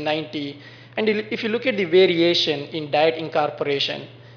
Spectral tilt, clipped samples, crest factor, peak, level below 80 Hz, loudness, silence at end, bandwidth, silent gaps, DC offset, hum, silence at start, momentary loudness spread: -5.5 dB/octave; under 0.1%; 16 dB; -6 dBFS; -72 dBFS; -21 LUFS; 0 s; 5.4 kHz; none; under 0.1%; none; 0 s; 14 LU